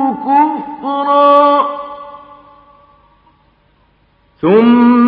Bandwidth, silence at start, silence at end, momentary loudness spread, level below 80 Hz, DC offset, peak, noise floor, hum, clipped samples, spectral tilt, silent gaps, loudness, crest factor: 4.9 kHz; 0 s; 0 s; 19 LU; -58 dBFS; under 0.1%; 0 dBFS; -53 dBFS; none; under 0.1%; -9.5 dB/octave; none; -11 LUFS; 12 dB